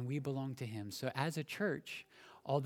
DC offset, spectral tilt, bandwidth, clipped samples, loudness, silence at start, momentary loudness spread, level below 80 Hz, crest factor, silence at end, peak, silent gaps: under 0.1%; -6 dB/octave; 17.5 kHz; under 0.1%; -41 LUFS; 0 s; 10 LU; -80 dBFS; 22 dB; 0 s; -18 dBFS; none